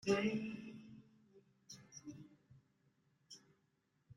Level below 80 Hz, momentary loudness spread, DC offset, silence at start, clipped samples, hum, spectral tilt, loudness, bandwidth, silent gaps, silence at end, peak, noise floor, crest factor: -80 dBFS; 23 LU; under 0.1%; 0.05 s; under 0.1%; none; -5 dB/octave; -43 LUFS; 11 kHz; none; 0.05 s; -22 dBFS; -81 dBFS; 24 dB